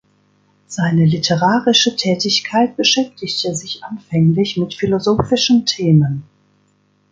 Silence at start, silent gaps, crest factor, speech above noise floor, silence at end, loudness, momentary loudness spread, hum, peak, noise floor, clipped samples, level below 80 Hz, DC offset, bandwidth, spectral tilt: 0.7 s; none; 16 dB; 43 dB; 0.9 s; -15 LUFS; 9 LU; 50 Hz at -40 dBFS; -2 dBFS; -59 dBFS; under 0.1%; -48 dBFS; under 0.1%; 7.8 kHz; -5 dB/octave